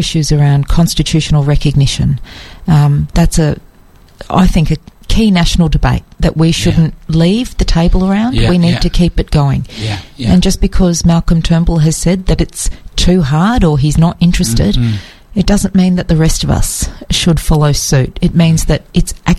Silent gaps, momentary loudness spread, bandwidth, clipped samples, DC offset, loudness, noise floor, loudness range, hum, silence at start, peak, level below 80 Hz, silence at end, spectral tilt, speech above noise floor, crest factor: none; 6 LU; 14 kHz; under 0.1%; under 0.1%; -12 LUFS; -41 dBFS; 1 LU; none; 0 s; 0 dBFS; -18 dBFS; 0 s; -5.5 dB/octave; 31 dB; 10 dB